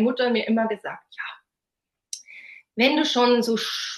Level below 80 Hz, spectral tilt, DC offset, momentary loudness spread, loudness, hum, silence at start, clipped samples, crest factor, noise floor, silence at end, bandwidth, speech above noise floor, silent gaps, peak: -72 dBFS; -3.5 dB/octave; under 0.1%; 18 LU; -22 LUFS; none; 0 s; under 0.1%; 20 dB; -86 dBFS; 0 s; 12.5 kHz; 64 dB; none; -6 dBFS